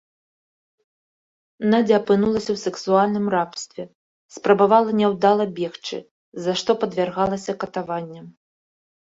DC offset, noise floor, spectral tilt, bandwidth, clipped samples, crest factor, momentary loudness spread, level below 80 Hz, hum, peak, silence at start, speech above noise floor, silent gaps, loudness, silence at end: under 0.1%; under -90 dBFS; -5.5 dB/octave; 7.8 kHz; under 0.1%; 20 dB; 15 LU; -60 dBFS; none; -2 dBFS; 1.6 s; over 70 dB; 3.95-4.29 s, 6.11-6.32 s; -21 LUFS; 0.9 s